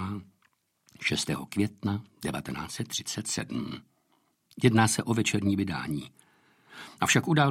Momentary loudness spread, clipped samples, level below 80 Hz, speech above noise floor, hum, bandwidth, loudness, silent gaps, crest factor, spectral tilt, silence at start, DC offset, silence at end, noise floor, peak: 15 LU; under 0.1%; -62 dBFS; 43 dB; none; 16 kHz; -29 LUFS; none; 22 dB; -4.5 dB/octave; 0 s; under 0.1%; 0 s; -71 dBFS; -8 dBFS